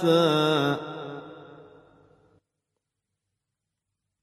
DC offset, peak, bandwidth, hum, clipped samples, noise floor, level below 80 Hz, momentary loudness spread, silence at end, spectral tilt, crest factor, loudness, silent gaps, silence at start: under 0.1%; -10 dBFS; 14 kHz; none; under 0.1%; -84 dBFS; -74 dBFS; 23 LU; 2.6 s; -6 dB/octave; 18 dB; -24 LUFS; none; 0 s